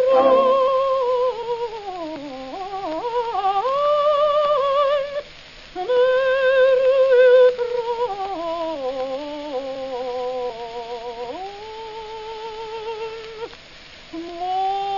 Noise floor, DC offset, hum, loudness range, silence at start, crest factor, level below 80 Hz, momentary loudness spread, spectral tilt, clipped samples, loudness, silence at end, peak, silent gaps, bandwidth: -43 dBFS; 0.1%; none; 13 LU; 0 s; 16 dB; -54 dBFS; 18 LU; -4 dB/octave; under 0.1%; -20 LUFS; 0 s; -6 dBFS; none; 7.4 kHz